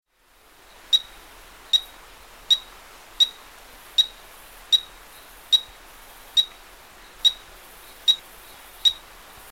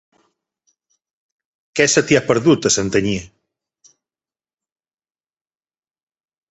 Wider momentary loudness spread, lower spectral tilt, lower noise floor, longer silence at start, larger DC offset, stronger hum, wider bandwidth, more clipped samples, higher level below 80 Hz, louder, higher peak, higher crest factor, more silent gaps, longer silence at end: first, 22 LU vs 10 LU; second, 1.5 dB/octave vs -3.5 dB/octave; second, -57 dBFS vs under -90 dBFS; second, 0.9 s vs 1.75 s; first, 0.1% vs under 0.1%; neither; first, 16.5 kHz vs 8.2 kHz; neither; second, -56 dBFS vs -50 dBFS; second, -21 LUFS vs -16 LUFS; second, -8 dBFS vs 0 dBFS; about the same, 20 dB vs 22 dB; neither; second, 0.55 s vs 3.25 s